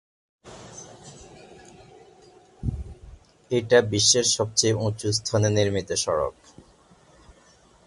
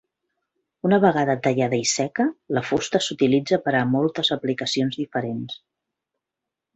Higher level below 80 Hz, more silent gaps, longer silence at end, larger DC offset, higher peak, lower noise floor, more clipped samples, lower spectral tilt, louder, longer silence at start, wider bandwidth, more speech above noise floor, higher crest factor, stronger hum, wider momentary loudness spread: first, -46 dBFS vs -62 dBFS; neither; first, 1.55 s vs 1.2 s; neither; about the same, -4 dBFS vs -4 dBFS; second, -56 dBFS vs -86 dBFS; neither; about the same, -3.5 dB/octave vs -4.5 dB/octave; about the same, -22 LUFS vs -22 LUFS; second, 0.45 s vs 0.85 s; first, 11.5 kHz vs 8.4 kHz; second, 34 dB vs 64 dB; about the same, 22 dB vs 20 dB; neither; first, 25 LU vs 9 LU